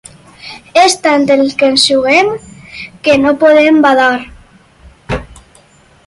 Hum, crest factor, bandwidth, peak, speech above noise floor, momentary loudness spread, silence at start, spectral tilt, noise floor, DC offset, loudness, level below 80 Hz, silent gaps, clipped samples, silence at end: none; 12 dB; 11.5 kHz; 0 dBFS; 36 dB; 19 LU; 0.45 s; -3.5 dB/octave; -45 dBFS; under 0.1%; -9 LUFS; -40 dBFS; none; under 0.1%; 0.85 s